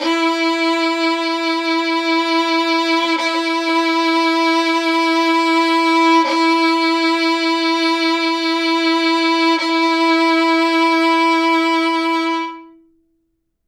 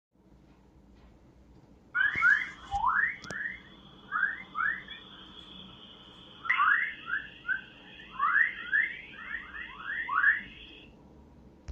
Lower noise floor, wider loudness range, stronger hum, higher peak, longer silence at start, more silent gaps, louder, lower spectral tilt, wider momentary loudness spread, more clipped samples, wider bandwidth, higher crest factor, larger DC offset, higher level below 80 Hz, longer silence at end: first, -68 dBFS vs -59 dBFS; about the same, 2 LU vs 4 LU; neither; first, -4 dBFS vs -12 dBFS; second, 0 s vs 1.95 s; neither; first, -15 LUFS vs -29 LUFS; second, -0.5 dB/octave vs -3 dB/octave; second, 4 LU vs 23 LU; neither; first, 12 kHz vs 9 kHz; second, 12 dB vs 20 dB; neither; second, -72 dBFS vs -60 dBFS; first, 1 s vs 0 s